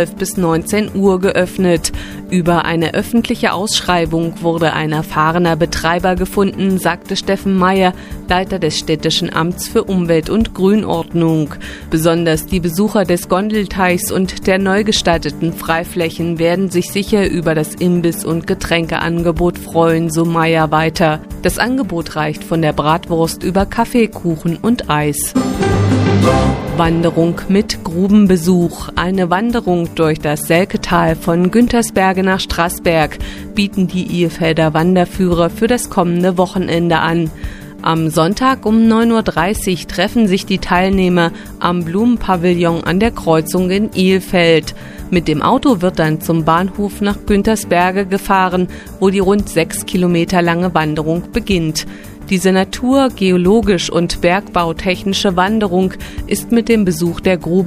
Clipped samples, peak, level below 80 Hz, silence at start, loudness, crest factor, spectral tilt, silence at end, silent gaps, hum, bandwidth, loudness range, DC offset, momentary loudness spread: under 0.1%; 0 dBFS; -32 dBFS; 0 s; -14 LUFS; 14 dB; -5.5 dB/octave; 0 s; none; none; 15.5 kHz; 2 LU; under 0.1%; 6 LU